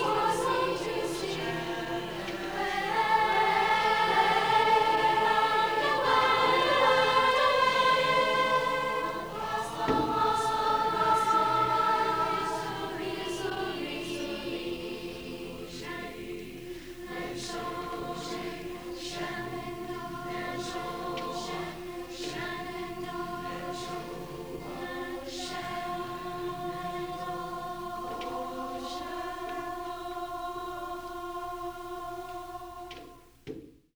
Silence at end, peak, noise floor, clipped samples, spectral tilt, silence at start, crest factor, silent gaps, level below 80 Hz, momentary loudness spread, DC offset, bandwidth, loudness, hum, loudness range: 0.25 s; -12 dBFS; -50 dBFS; under 0.1%; -3.5 dB/octave; 0 s; 18 dB; none; -54 dBFS; 16 LU; under 0.1%; over 20 kHz; -30 LUFS; none; 13 LU